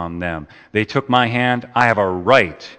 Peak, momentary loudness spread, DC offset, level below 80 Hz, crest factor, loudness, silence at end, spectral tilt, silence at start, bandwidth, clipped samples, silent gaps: 0 dBFS; 11 LU; under 0.1%; -48 dBFS; 18 dB; -17 LUFS; 0.05 s; -6 dB/octave; 0 s; 9 kHz; under 0.1%; none